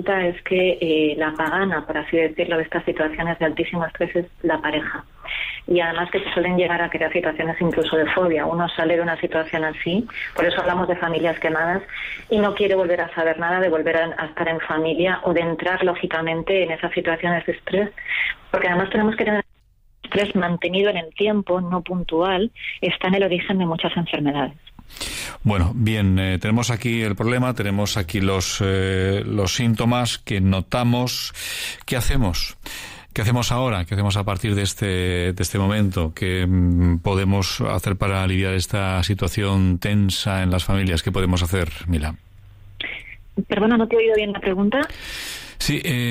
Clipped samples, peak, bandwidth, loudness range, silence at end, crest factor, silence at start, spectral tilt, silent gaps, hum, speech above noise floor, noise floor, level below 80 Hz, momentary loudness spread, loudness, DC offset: under 0.1%; -8 dBFS; 16 kHz; 2 LU; 0 s; 14 dB; 0 s; -5.5 dB/octave; none; none; 35 dB; -56 dBFS; -40 dBFS; 6 LU; -21 LUFS; under 0.1%